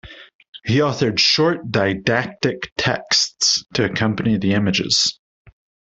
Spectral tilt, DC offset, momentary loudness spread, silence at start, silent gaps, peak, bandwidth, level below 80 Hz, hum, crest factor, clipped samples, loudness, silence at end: -3.5 dB/octave; under 0.1%; 7 LU; 0.05 s; 0.34-0.39 s, 0.48-0.53 s, 2.72-2.76 s, 5.19-5.45 s; -2 dBFS; 8.4 kHz; -52 dBFS; none; 18 dB; under 0.1%; -18 LUFS; 0.45 s